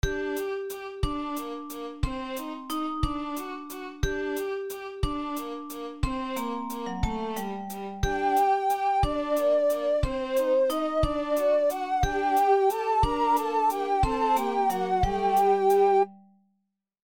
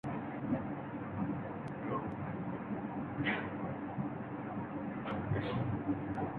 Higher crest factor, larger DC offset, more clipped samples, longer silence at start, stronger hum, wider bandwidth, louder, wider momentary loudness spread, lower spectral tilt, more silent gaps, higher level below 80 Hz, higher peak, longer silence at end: about the same, 16 dB vs 18 dB; neither; neither; about the same, 0.05 s vs 0.05 s; neither; first, 19 kHz vs 4.8 kHz; first, -27 LUFS vs -39 LUFS; first, 12 LU vs 6 LU; about the same, -5.5 dB/octave vs -6.5 dB/octave; neither; first, -38 dBFS vs -60 dBFS; first, -10 dBFS vs -22 dBFS; first, 0.8 s vs 0 s